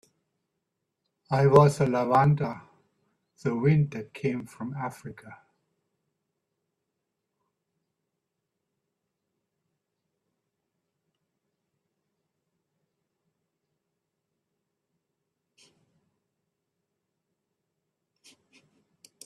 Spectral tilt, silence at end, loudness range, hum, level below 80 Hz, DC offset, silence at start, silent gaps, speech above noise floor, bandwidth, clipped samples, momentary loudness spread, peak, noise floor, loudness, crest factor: -8 dB/octave; 13.9 s; 17 LU; none; -66 dBFS; under 0.1%; 1.3 s; none; 59 dB; 12 kHz; under 0.1%; 18 LU; -4 dBFS; -83 dBFS; -25 LUFS; 28 dB